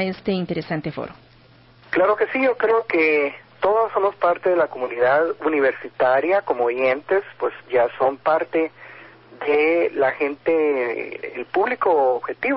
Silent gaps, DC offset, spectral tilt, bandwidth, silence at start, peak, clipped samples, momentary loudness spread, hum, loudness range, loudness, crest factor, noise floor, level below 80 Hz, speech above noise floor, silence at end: none; under 0.1%; -10.5 dB/octave; 5.8 kHz; 0 s; -8 dBFS; under 0.1%; 9 LU; none; 2 LU; -21 LUFS; 14 dB; -51 dBFS; -62 dBFS; 31 dB; 0 s